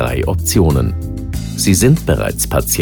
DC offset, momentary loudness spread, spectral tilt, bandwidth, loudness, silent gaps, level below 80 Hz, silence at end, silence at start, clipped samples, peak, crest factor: under 0.1%; 12 LU; -5 dB/octave; over 20 kHz; -15 LUFS; none; -24 dBFS; 0 s; 0 s; under 0.1%; 0 dBFS; 14 dB